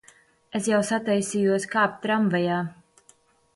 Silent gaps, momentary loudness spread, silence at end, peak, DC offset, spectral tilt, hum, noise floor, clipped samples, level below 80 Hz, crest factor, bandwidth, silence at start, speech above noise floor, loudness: none; 7 LU; 0.85 s; -8 dBFS; under 0.1%; -5 dB/octave; none; -60 dBFS; under 0.1%; -68 dBFS; 16 dB; 11.5 kHz; 0.55 s; 36 dB; -24 LUFS